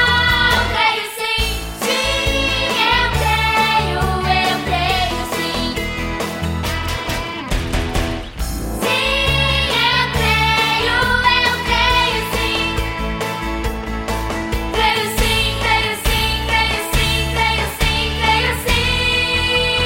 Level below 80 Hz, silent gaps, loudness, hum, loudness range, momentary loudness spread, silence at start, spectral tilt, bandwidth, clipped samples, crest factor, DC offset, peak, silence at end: -26 dBFS; none; -16 LUFS; none; 6 LU; 8 LU; 0 s; -3.5 dB/octave; 17 kHz; under 0.1%; 16 dB; under 0.1%; -2 dBFS; 0 s